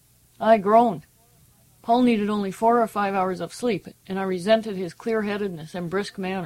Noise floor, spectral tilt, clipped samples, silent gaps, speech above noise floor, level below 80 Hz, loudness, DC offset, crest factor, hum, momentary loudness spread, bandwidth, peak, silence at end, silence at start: -57 dBFS; -6 dB/octave; under 0.1%; none; 35 dB; -62 dBFS; -23 LUFS; under 0.1%; 18 dB; none; 12 LU; 15.5 kHz; -6 dBFS; 0 s; 0.4 s